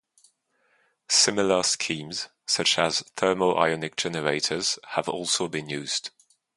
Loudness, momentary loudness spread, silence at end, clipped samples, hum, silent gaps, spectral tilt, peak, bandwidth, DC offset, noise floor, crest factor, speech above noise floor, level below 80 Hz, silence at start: -24 LUFS; 10 LU; 0.5 s; under 0.1%; none; none; -2 dB/octave; -4 dBFS; 11.5 kHz; under 0.1%; -69 dBFS; 22 dB; 43 dB; -64 dBFS; 1.1 s